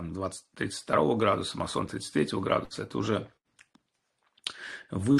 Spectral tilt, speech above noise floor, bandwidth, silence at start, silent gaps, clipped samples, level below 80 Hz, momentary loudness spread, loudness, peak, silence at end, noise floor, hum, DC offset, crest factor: -5.5 dB/octave; 47 dB; 12.5 kHz; 0 s; none; under 0.1%; -60 dBFS; 12 LU; -30 LUFS; -10 dBFS; 0 s; -76 dBFS; none; under 0.1%; 20 dB